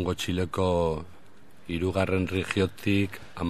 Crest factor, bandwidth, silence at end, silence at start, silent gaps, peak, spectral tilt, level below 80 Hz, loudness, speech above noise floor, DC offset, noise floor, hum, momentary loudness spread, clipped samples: 18 dB; 14.5 kHz; 0 s; 0 s; none; -10 dBFS; -6 dB/octave; -48 dBFS; -28 LUFS; 28 dB; 0.6%; -56 dBFS; none; 10 LU; under 0.1%